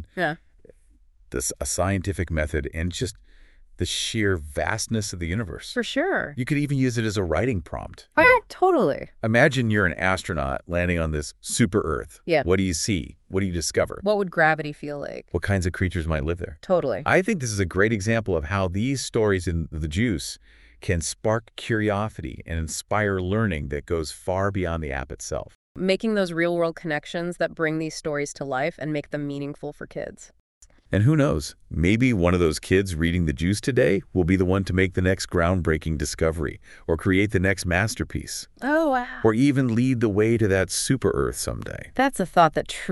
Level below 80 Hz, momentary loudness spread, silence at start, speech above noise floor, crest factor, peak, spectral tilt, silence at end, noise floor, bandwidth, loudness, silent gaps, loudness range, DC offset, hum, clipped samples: -40 dBFS; 11 LU; 0 s; 32 dB; 20 dB; -2 dBFS; -5.5 dB/octave; 0 s; -56 dBFS; 12 kHz; -24 LUFS; 25.55-25.75 s, 30.40-30.61 s; 5 LU; under 0.1%; none; under 0.1%